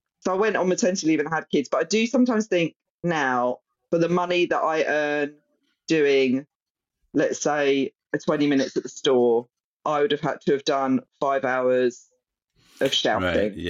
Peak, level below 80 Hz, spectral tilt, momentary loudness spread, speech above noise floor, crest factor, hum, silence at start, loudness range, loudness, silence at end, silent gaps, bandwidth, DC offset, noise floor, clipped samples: -10 dBFS; -66 dBFS; -4.5 dB/octave; 7 LU; 65 dB; 14 dB; none; 0.25 s; 1 LU; -23 LUFS; 0 s; 2.76-2.80 s, 2.90-2.99 s, 6.55-6.75 s, 9.64-9.80 s; 12 kHz; under 0.1%; -87 dBFS; under 0.1%